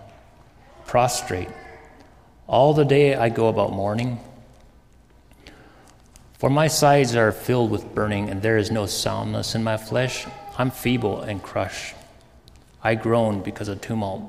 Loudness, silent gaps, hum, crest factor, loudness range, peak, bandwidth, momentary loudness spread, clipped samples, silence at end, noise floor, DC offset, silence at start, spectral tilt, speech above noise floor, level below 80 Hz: -22 LUFS; none; none; 20 dB; 6 LU; -4 dBFS; 15.5 kHz; 13 LU; under 0.1%; 0 s; -53 dBFS; under 0.1%; 0 s; -5.5 dB/octave; 32 dB; -48 dBFS